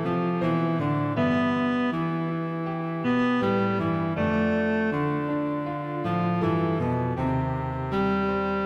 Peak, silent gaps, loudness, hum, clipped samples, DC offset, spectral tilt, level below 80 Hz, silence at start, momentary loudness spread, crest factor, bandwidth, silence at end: -12 dBFS; none; -26 LUFS; none; under 0.1%; under 0.1%; -8.5 dB/octave; -48 dBFS; 0 s; 5 LU; 12 dB; 7.4 kHz; 0 s